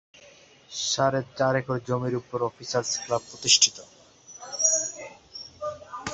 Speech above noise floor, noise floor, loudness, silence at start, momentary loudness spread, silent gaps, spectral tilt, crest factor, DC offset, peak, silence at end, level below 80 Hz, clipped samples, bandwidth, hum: 27 dB; -53 dBFS; -25 LUFS; 0.25 s; 22 LU; none; -2 dB/octave; 24 dB; under 0.1%; -4 dBFS; 0 s; -62 dBFS; under 0.1%; 8.4 kHz; none